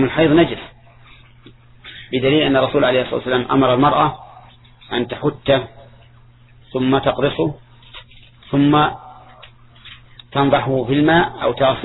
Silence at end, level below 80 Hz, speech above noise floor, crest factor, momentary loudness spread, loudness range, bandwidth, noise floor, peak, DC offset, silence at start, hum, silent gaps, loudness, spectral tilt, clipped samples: 0 s; -44 dBFS; 31 dB; 18 dB; 18 LU; 4 LU; 4.1 kHz; -47 dBFS; -2 dBFS; under 0.1%; 0 s; none; none; -17 LUFS; -9.5 dB/octave; under 0.1%